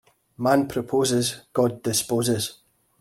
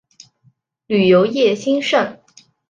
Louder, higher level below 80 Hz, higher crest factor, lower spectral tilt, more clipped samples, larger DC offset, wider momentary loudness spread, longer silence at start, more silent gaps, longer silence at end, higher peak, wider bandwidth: second, -23 LUFS vs -16 LUFS; about the same, -60 dBFS vs -62 dBFS; about the same, 18 dB vs 16 dB; about the same, -4.5 dB/octave vs -5.5 dB/octave; neither; neither; about the same, 5 LU vs 7 LU; second, 0.4 s vs 0.9 s; neither; about the same, 0.45 s vs 0.55 s; second, -6 dBFS vs -2 dBFS; first, 16.5 kHz vs 9 kHz